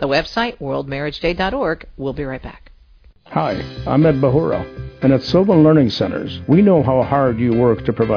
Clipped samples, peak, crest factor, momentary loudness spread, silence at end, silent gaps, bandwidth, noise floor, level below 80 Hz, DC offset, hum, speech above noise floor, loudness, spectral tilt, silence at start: under 0.1%; -2 dBFS; 14 dB; 13 LU; 0 s; none; 5.4 kHz; -48 dBFS; -38 dBFS; under 0.1%; none; 32 dB; -17 LUFS; -8 dB/octave; 0 s